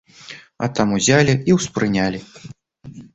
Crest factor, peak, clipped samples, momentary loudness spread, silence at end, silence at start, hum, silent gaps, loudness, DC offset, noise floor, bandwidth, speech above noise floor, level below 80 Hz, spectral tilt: 18 dB; -2 dBFS; under 0.1%; 23 LU; 0.1 s; 0.3 s; none; none; -18 LUFS; under 0.1%; -41 dBFS; 8.2 kHz; 23 dB; -48 dBFS; -5 dB/octave